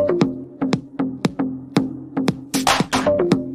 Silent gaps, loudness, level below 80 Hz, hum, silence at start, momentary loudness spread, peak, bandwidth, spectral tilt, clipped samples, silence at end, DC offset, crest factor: none; -21 LUFS; -50 dBFS; none; 0 s; 8 LU; -2 dBFS; 15.5 kHz; -5 dB/octave; under 0.1%; 0 s; under 0.1%; 18 dB